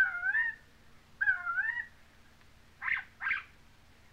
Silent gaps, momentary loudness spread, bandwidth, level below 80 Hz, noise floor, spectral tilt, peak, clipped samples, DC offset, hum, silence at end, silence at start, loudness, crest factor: none; 10 LU; 15.5 kHz; -66 dBFS; -59 dBFS; -2.5 dB/octave; -18 dBFS; under 0.1%; under 0.1%; none; 0.65 s; 0 s; -32 LUFS; 18 dB